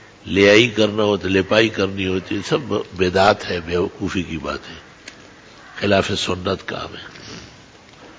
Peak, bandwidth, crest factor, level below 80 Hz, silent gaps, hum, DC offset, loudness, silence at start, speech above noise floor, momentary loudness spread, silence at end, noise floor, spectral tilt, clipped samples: -2 dBFS; 8 kHz; 18 dB; -42 dBFS; none; none; under 0.1%; -18 LUFS; 0.25 s; 26 dB; 22 LU; 0.05 s; -45 dBFS; -5 dB/octave; under 0.1%